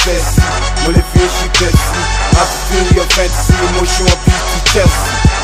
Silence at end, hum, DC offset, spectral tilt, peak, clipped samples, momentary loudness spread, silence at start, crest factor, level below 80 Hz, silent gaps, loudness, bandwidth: 0 s; none; under 0.1%; -4 dB/octave; 0 dBFS; 0.4%; 3 LU; 0 s; 10 dB; -14 dBFS; none; -11 LUFS; 16 kHz